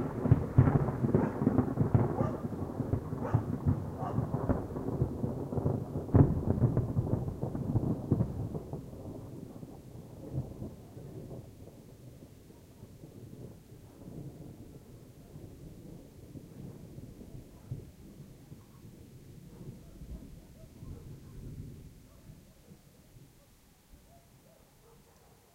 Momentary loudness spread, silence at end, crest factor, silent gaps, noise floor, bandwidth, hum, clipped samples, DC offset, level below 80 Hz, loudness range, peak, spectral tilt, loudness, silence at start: 24 LU; 1.35 s; 26 dB; none; -61 dBFS; 16 kHz; none; under 0.1%; under 0.1%; -48 dBFS; 19 LU; -10 dBFS; -10 dB/octave; -32 LUFS; 0 s